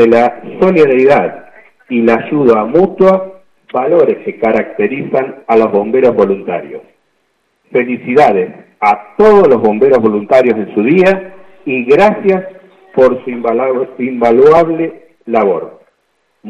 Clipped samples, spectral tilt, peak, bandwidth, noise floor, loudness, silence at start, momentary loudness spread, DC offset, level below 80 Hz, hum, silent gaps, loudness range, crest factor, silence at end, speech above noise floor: under 0.1%; -8 dB/octave; 0 dBFS; 8 kHz; -61 dBFS; -11 LUFS; 0 s; 11 LU; under 0.1%; -48 dBFS; none; none; 4 LU; 10 dB; 0 s; 51 dB